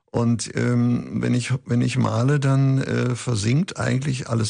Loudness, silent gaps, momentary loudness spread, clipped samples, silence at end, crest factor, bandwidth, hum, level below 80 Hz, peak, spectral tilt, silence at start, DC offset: -22 LUFS; none; 4 LU; under 0.1%; 0 s; 12 dB; 10.5 kHz; none; -52 dBFS; -8 dBFS; -6.5 dB/octave; 0.15 s; under 0.1%